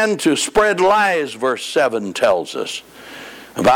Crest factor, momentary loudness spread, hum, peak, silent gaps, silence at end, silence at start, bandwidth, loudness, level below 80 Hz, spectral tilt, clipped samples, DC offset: 12 dB; 19 LU; none; -6 dBFS; none; 0 s; 0 s; 18 kHz; -17 LUFS; -48 dBFS; -3.5 dB/octave; under 0.1%; under 0.1%